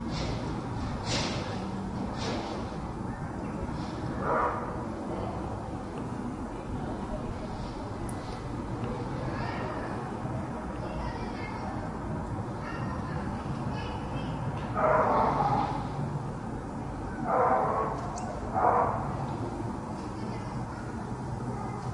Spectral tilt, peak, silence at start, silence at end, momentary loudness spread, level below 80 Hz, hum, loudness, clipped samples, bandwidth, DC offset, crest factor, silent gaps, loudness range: -6.5 dB/octave; -12 dBFS; 0 s; 0 s; 11 LU; -44 dBFS; none; -33 LUFS; under 0.1%; 11.5 kHz; under 0.1%; 20 dB; none; 6 LU